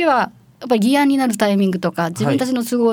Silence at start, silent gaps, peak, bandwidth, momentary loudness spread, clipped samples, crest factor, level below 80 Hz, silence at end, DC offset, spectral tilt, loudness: 0 s; none; -4 dBFS; 19.5 kHz; 6 LU; under 0.1%; 12 dB; -64 dBFS; 0 s; under 0.1%; -5.5 dB/octave; -17 LUFS